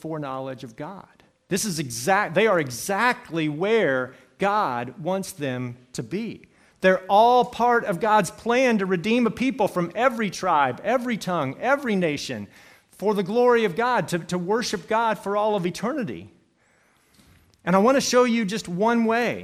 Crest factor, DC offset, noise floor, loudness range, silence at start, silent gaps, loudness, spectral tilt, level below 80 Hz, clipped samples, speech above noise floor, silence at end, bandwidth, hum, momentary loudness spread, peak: 18 dB; under 0.1%; -62 dBFS; 5 LU; 0.05 s; none; -23 LUFS; -5 dB/octave; -62 dBFS; under 0.1%; 40 dB; 0 s; 15.5 kHz; none; 13 LU; -4 dBFS